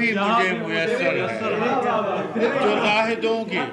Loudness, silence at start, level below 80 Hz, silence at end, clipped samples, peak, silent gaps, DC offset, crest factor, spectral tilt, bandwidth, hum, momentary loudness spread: -21 LUFS; 0 s; -64 dBFS; 0 s; under 0.1%; -10 dBFS; none; under 0.1%; 10 dB; -5 dB/octave; 11 kHz; none; 4 LU